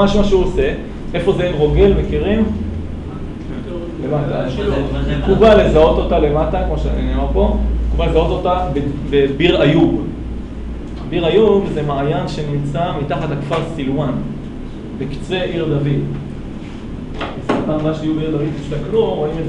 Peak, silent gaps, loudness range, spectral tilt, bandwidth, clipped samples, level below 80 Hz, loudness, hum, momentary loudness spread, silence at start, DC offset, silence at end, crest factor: 0 dBFS; none; 7 LU; -7.5 dB/octave; 9.6 kHz; under 0.1%; -24 dBFS; -17 LUFS; none; 15 LU; 0 s; 0.1%; 0 s; 16 dB